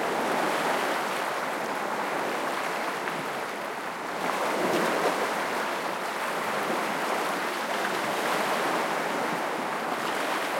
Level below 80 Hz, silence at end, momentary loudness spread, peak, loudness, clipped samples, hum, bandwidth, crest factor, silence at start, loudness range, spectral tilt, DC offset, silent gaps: -74 dBFS; 0 s; 4 LU; -10 dBFS; -28 LUFS; under 0.1%; none; 16.5 kHz; 18 dB; 0 s; 2 LU; -3 dB/octave; under 0.1%; none